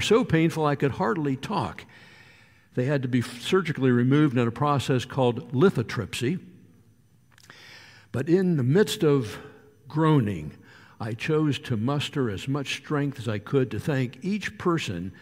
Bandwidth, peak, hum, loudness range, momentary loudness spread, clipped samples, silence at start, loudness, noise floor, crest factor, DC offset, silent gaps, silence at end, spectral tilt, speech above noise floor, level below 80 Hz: 16 kHz; -8 dBFS; none; 4 LU; 13 LU; under 0.1%; 0 s; -25 LUFS; -59 dBFS; 18 dB; under 0.1%; none; 0.1 s; -6.5 dB/octave; 35 dB; -58 dBFS